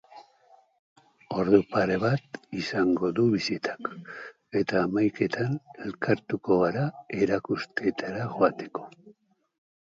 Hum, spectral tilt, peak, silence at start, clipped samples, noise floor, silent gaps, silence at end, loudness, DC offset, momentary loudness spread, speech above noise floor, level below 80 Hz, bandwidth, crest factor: none; -7 dB/octave; -6 dBFS; 0.1 s; under 0.1%; -60 dBFS; 0.79-0.96 s; 0.8 s; -27 LUFS; under 0.1%; 14 LU; 33 dB; -62 dBFS; 7.8 kHz; 22 dB